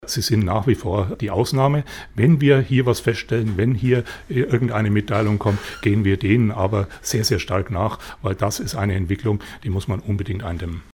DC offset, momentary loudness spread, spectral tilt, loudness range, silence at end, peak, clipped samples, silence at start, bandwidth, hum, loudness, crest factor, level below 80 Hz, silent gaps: under 0.1%; 8 LU; -6 dB/octave; 4 LU; 0.1 s; -4 dBFS; under 0.1%; 0 s; 18.5 kHz; none; -21 LUFS; 16 dB; -42 dBFS; none